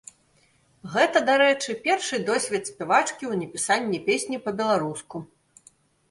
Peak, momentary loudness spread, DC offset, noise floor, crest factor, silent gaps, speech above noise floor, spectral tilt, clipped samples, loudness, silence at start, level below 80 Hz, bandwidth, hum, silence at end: -6 dBFS; 11 LU; under 0.1%; -63 dBFS; 20 dB; none; 39 dB; -3 dB/octave; under 0.1%; -24 LUFS; 0.85 s; -70 dBFS; 11.5 kHz; none; 0.85 s